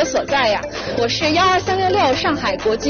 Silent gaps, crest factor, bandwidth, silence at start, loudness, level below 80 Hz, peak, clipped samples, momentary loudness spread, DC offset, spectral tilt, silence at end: none; 12 dB; 7 kHz; 0 s; -17 LUFS; -42 dBFS; -6 dBFS; under 0.1%; 5 LU; under 0.1%; -2 dB/octave; 0 s